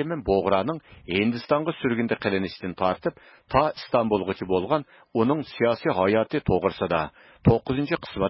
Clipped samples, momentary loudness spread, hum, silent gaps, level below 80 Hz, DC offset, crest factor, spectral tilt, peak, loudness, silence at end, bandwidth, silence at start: under 0.1%; 6 LU; none; none; -46 dBFS; under 0.1%; 18 dB; -11 dB/octave; -6 dBFS; -25 LUFS; 0 s; 5.8 kHz; 0 s